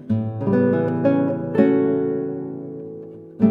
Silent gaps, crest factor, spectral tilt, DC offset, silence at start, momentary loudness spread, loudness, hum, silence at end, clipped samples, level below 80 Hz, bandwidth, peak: none; 18 dB; -11 dB/octave; under 0.1%; 0 s; 16 LU; -20 LUFS; none; 0 s; under 0.1%; -60 dBFS; 5 kHz; -2 dBFS